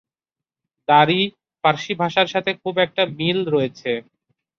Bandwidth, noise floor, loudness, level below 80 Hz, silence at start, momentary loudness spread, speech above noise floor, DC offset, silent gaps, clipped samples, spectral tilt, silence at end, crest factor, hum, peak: 7.4 kHz; -89 dBFS; -20 LUFS; -64 dBFS; 0.9 s; 10 LU; 70 dB; under 0.1%; none; under 0.1%; -5.5 dB/octave; 0.6 s; 20 dB; none; -2 dBFS